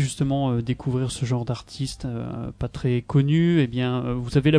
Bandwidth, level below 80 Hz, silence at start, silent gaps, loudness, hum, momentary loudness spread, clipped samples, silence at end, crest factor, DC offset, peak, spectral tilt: 11 kHz; -44 dBFS; 0 s; none; -24 LUFS; none; 11 LU; under 0.1%; 0 s; 16 dB; under 0.1%; -6 dBFS; -7 dB/octave